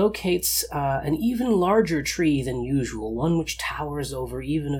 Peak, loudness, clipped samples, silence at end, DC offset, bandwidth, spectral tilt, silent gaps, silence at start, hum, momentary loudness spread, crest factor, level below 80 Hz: -8 dBFS; -24 LUFS; under 0.1%; 0 s; under 0.1%; 19 kHz; -5 dB/octave; none; 0 s; none; 9 LU; 16 dB; -42 dBFS